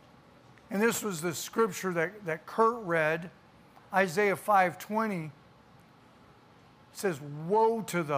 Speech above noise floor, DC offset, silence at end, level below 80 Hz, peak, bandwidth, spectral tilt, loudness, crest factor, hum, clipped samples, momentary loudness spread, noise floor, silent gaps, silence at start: 29 dB; under 0.1%; 0 s; -72 dBFS; -10 dBFS; 15.5 kHz; -4.5 dB/octave; -30 LUFS; 20 dB; none; under 0.1%; 11 LU; -58 dBFS; none; 0.7 s